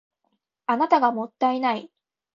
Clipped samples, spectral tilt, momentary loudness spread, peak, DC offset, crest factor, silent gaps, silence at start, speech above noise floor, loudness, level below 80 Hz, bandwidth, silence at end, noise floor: under 0.1%; -6 dB/octave; 10 LU; -6 dBFS; under 0.1%; 20 dB; none; 0.7 s; 53 dB; -23 LUFS; -76 dBFS; 7.2 kHz; 0.5 s; -75 dBFS